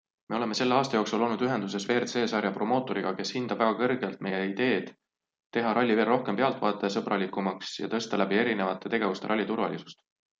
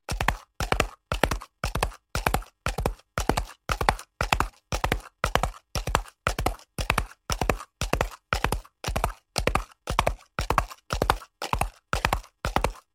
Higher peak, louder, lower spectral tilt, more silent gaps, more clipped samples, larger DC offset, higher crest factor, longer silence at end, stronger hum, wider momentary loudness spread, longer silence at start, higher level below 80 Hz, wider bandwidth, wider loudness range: second, -8 dBFS vs -2 dBFS; about the same, -28 LUFS vs -29 LUFS; about the same, -5 dB/octave vs -4 dB/octave; first, 5.46-5.51 s vs none; neither; neither; second, 20 dB vs 26 dB; first, 0.45 s vs 0.15 s; neither; about the same, 7 LU vs 6 LU; first, 0.3 s vs 0.1 s; second, -74 dBFS vs -34 dBFS; second, 8.6 kHz vs 16.5 kHz; about the same, 2 LU vs 1 LU